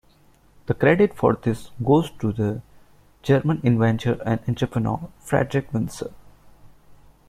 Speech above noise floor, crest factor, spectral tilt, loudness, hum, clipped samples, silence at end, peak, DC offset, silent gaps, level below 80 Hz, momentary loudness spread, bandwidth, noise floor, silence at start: 34 dB; 20 dB; -7.5 dB/octave; -22 LUFS; none; under 0.1%; 0.35 s; -4 dBFS; under 0.1%; none; -50 dBFS; 12 LU; 14.5 kHz; -55 dBFS; 0.7 s